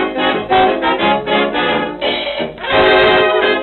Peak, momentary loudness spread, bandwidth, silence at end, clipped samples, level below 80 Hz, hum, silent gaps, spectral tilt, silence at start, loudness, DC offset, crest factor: 0 dBFS; 8 LU; 4.5 kHz; 0 s; under 0.1%; -42 dBFS; none; none; -7 dB/octave; 0 s; -13 LUFS; under 0.1%; 14 dB